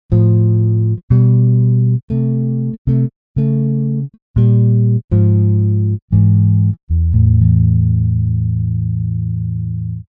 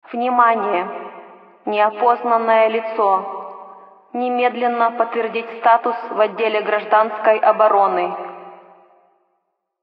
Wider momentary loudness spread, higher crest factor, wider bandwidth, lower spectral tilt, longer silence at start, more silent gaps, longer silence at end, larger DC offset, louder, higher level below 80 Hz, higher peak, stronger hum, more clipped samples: second, 8 LU vs 16 LU; second, 12 dB vs 18 dB; second, 1.5 kHz vs 5.2 kHz; first, -14.5 dB/octave vs -8 dB/octave; about the same, 0.1 s vs 0.1 s; first, 1.03-1.08 s, 2.03-2.08 s, 2.78-2.85 s, 3.16-3.35 s, 4.22-4.34 s, 5.04-5.08 s, 6.02-6.08 s, 6.83-6.87 s vs none; second, 0.05 s vs 1.3 s; neither; first, -14 LUFS vs -17 LUFS; first, -28 dBFS vs -86 dBFS; about the same, 0 dBFS vs -2 dBFS; neither; neither